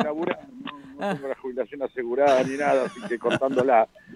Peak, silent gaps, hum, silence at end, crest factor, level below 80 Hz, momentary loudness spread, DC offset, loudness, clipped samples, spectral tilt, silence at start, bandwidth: -6 dBFS; none; none; 0 s; 18 dB; -68 dBFS; 12 LU; under 0.1%; -24 LUFS; under 0.1%; -5.5 dB/octave; 0 s; 11.5 kHz